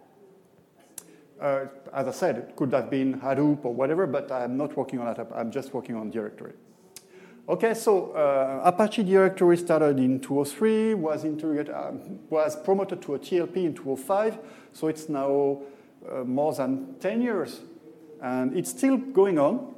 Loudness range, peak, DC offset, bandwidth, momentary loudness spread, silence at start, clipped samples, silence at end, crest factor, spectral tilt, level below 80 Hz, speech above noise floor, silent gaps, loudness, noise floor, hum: 7 LU; -6 dBFS; under 0.1%; 15.5 kHz; 14 LU; 0.95 s; under 0.1%; 0.05 s; 20 dB; -6.5 dB/octave; -80 dBFS; 33 dB; none; -26 LUFS; -58 dBFS; none